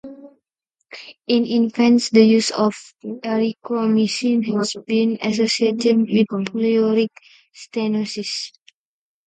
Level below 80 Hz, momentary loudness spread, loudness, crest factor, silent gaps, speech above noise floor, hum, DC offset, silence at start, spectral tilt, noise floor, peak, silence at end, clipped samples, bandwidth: -68 dBFS; 15 LU; -19 LUFS; 18 dB; none; 58 dB; none; under 0.1%; 0.05 s; -5 dB/octave; -76 dBFS; 0 dBFS; 0.8 s; under 0.1%; 9.2 kHz